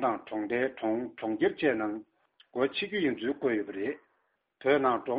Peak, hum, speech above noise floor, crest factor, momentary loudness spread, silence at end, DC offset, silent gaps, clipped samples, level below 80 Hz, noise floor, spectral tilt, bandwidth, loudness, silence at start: -12 dBFS; none; 46 dB; 18 dB; 9 LU; 0 s; under 0.1%; none; under 0.1%; -70 dBFS; -75 dBFS; -3.5 dB/octave; 5 kHz; -31 LUFS; 0 s